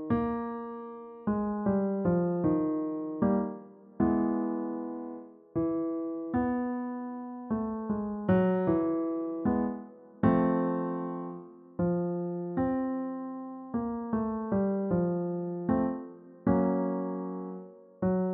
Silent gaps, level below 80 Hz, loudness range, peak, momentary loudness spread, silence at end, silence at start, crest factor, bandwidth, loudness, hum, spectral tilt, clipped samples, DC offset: none; -58 dBFS; 4 LU; -12 dBFS; 13 LU; 0 s; 0 s; 18 dB; 3.9 kHz; -31 LUFS; none; -10 dB/octave; under 0.1%; under 0.1%